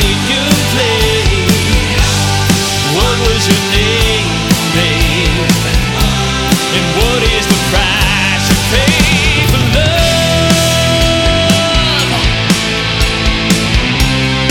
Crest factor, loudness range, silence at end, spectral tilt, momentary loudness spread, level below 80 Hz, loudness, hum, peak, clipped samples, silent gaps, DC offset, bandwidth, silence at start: 10 dB; 2 LU; 0 s; -4 dB/octave; 2 LU; -18 dBFS; -10 LUFS; none; 0 dBFS; under 0.1%; none; under 0.1%; 18 kHz; 0 s